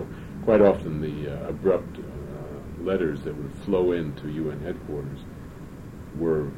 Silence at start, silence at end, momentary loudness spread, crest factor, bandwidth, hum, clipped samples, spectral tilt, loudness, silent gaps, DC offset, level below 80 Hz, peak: 0 s; 0 s; 19 LU; 20 dB; 16 kHz; none; under 0.1%; -8.5 dB/octave; -26 LUFS; none; under 0.1%; -44 dBFS; -6 dBFS